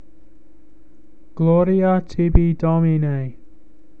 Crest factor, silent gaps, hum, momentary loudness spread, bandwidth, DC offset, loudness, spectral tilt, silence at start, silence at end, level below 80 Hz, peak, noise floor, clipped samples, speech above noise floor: 20 dB; none; none; 10 LU; 5 kHz; 2%; -18 LUFS; -10.5 dB/octave; 1.35 s; 0.7 s; -28 dBFS; 0 dBFS; -52 dBFS; under 0.1%; 35 dB